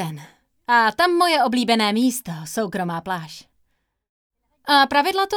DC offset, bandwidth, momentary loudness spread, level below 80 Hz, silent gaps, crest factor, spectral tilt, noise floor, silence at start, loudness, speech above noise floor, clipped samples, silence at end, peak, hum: under 0.1%; 19 kHz; 16 LU; -62 dBFS; 4.09-4.30 s; 18 dB; -3.5 dB/octave; -69 dBFS; 0 s; -19 LUFS; 50 dB; under 0.1%; 0 s; -2 dBFS; none